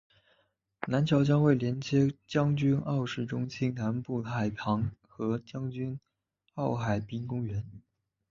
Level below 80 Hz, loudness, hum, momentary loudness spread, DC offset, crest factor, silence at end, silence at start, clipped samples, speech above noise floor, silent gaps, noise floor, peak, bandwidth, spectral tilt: -58 dBFS; -31 LUFS; none; 12 LU; under 0.1%; 18 dB; 0.5 s; 0.8 s; under 0.1%; 43 dB; none; -73 dBFS; -12 dBFS; 7.4 kHz; -7.5 dB/octave